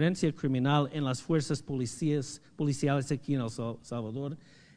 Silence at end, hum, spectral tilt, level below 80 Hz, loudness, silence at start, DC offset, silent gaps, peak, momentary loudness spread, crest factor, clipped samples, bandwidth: 0.35 s; none; -6.5 dB/octave; -62 dBFS; -32 LUFS; 0 s; under 0.1%; none; -12 dBFS; 10 LU; 18 dB; under 0.1%; 10 kHz